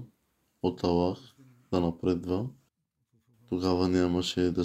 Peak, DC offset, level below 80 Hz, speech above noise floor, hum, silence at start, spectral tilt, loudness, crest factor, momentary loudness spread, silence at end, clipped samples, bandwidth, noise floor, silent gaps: -14 dBFS; under 0.1%; -60 dBFS; 49 dB; none; 0 s; -6.5 dB/octave; -29 LUFS; 18 dB; 8 LU; 0 s; under 0.1%; 13 kHz; -77 dBFS; none